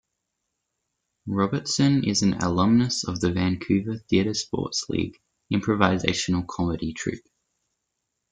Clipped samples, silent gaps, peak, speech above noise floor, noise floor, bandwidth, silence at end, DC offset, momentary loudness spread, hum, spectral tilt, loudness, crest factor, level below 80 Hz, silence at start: under 0.1%; none; -2 dBFS; 57 dB; -80 dBFS; 9.4 kHz; 1.15 s; under 0.1%; 9 LU; none; -5 dB/octave; -24 LUFS; 22 dB; -52 dBFS; 1.25 s